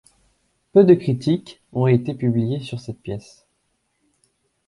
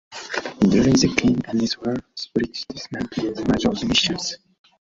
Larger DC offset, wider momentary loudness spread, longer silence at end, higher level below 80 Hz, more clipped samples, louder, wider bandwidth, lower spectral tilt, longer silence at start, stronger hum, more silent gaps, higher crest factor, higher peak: neither; first, 17 LU vs 12 LU; first, 1.5 s vs 0.5 s; second, -56 dBFS vs -46 dBFS; neither; about the same, -20 LUFS vs -21 LUFS; first, 11 kHz vs 7.8 kHz; first, -9 dB/octave vs -4.5 dB/octave; first, 0.75 s vs 0.1 s; neither; neither; about the same, 20 dB vs 20 dB; about the same, -2 dBFS vs -2 dBFS